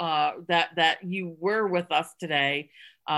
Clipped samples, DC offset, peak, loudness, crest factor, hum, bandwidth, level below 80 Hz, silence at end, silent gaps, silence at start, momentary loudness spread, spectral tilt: under 0.1%; under 0.1%; -8 dBFS; -26 LUFS; 18 dB; none; 12.5 kHz; -76 dBFS; 0 s; none; 0 s; 9 LU; -4.5 dB/octave